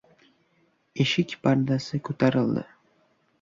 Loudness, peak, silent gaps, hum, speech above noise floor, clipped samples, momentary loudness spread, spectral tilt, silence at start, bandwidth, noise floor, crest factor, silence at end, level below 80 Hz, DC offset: -25 LUFS; -10 dBFS; none; none; 43 dB; under 0.1%; 9 LU; -6.5 dB/octave; 0.95 s; 7.6 kHz; -67 dBFS; 18 dB; 0.75 s; -62 dBFS; under 0.1%